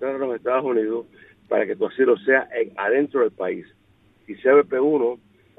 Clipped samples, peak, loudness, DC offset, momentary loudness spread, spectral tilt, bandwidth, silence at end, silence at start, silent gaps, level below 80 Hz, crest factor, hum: under 0.1%; -4 dBFS; -21 LUFS; under 0.1%; 11 LU; -8.5 dB/octave; 4 kHz; 0.45 s; 0 s; none; -70 dBFS; 18 dB; none